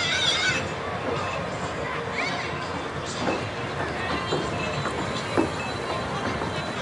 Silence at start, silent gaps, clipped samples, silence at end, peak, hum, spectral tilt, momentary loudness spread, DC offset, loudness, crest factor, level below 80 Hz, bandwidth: 0 s; none; under 0.1%; 0 s; -8 dBFS; none; -4 dB/octave; 7 LU; under 0.1%; -27 LUFS; 18 dB; -50 dBFS; 11.5 kHz